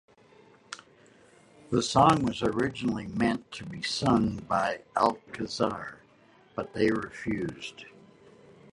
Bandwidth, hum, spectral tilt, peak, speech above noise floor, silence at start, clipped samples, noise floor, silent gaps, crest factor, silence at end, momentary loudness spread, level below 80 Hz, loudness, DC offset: 11.5 kHz; none; -5.5 dB/octave; -8 dBFS; 31 dB; 0.7 s; under 0.1%; -59 dBFS; none; 22 dB; 0.85 s; 19 LU; -56 dBFS; -28 LUFS; under 0.1%